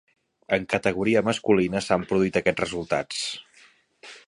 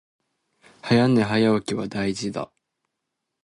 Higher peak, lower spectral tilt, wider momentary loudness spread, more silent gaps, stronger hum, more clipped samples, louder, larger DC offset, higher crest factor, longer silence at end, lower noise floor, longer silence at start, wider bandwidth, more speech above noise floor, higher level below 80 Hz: about the same, -4 dBFS vs -6 dBFS; about the same, -5 dB/octave vs -6 dB/octave; second, 8 LU vs 16 LU; neither; neither; neither; about the same, -24 LUFS vs -22 LUFS; neither; about the same, 20 dB vs 18 dB; second, 0.1 s vs 1 s; second, -57 dBFS vs -81 dBFS; second, 0.5 s vs 0.85 s; about the same, 11.5 kHz vs 11.5 kHz; second, 33 dB vs 60 dB; about the same, -54 dBFS vs -58 dBFS